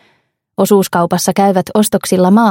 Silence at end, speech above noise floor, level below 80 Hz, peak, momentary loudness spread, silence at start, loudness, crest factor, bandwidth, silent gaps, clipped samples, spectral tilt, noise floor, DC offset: 0 s; 48 dB; -54 dBFS; 0 dBFS; 4 LU; 0.6 s; -12 LUFS; 12 dB; 17 kHz; none; under 0.1%; -5.5 dB/octave; -59 dBFS; under 0.1%